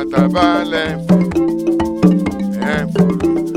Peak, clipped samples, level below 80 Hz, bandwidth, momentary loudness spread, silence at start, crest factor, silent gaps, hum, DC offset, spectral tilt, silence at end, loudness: 0 dBFS; under 0.1%; -38 dBFS; 13.5 kHz; 5 LU; 0 s; 14 dB; none; none; under 0.1%; -7.5 dB/octave; 0 s; -15 LUFS